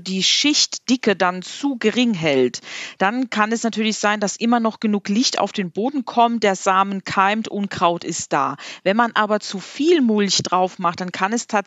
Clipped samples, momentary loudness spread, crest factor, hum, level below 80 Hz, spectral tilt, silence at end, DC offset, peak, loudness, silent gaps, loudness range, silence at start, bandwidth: under 0.1%; 7 LU; 18 dB; none; -70 dBFS; -3.5 dB/octave; 0 s; under 0.1%; -2 dBFS; -19 LUFS; none; 1 LU; 0 s; 9 kHz